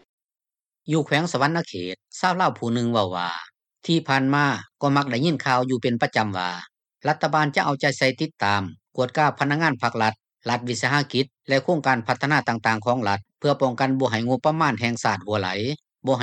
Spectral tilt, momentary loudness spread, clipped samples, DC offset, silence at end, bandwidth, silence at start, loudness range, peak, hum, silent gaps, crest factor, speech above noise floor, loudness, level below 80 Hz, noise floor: -5.5 dB/octave; 7 LU; under 0.1%; under 0.1%; 0 s; 11 kHz; 0.85 s; 1 LU; -6 dBFS; none; none; 18 dB; over 67 dB; -23 LUFS; -68 dBFS; under -90 dBFS